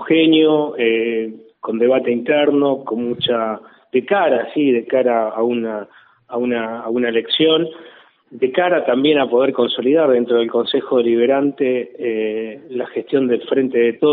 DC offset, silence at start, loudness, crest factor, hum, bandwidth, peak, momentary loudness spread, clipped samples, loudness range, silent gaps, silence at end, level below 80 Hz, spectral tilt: under 0.1%; 0 s; -17 LUFS; 16 dB; none; 4.5 kHz; -2 dBFS; 10 LU; under 0.1%; 3 LU; none; 0 s; -66 dBFS; -3 dB/octave